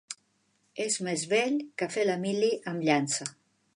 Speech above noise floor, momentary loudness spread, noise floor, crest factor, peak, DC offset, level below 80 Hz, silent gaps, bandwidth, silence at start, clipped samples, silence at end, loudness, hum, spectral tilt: 43 dB; 14 LU; -72 dBFS; 18 dB; -12 dBFS; under 0.1%; -82 dBFS; none; 11.5 kHz; 0.1 s; under 0.1%; 0.45 s; -29 LUFS; none; -3.5 dB/octave